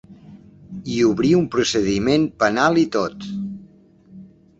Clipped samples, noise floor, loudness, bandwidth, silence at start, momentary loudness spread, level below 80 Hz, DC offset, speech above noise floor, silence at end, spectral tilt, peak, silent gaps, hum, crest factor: under 0.1%; -49 dBFS; -19 LUFS; 8 kHz; 0.1 s; 15 LU; -50 dBFS; under 0.1%; 31 dB; 0.35 s; -5 dB/octave; -2 dBFS; none; none; 18 dB